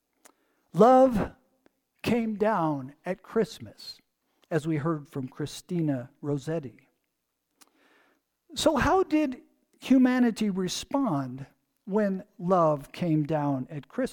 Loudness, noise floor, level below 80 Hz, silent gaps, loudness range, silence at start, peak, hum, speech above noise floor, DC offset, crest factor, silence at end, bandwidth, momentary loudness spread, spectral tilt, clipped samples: -27 LUFS; -80 dBFS; -52 dBFS; none; 7 LU; 0.75 s; -8 dBFS; none; 54 dB; under 0.1%; 20 dB; 0 s; 18 kHz; 15 LU; -6.5 dB/octave; under 0.1%